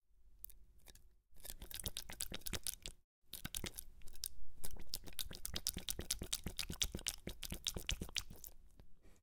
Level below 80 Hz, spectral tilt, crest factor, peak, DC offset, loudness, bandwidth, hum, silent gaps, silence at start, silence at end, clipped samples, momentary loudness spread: -54 dBFS; -1.5 dB/octave; 30 dB; -14 dBFS; under 0.1%; -45 LUFS; 18 kHz; none; 3.04-3.22 s; 0.2 s; 0.05 s; under 0.1%; 15 LU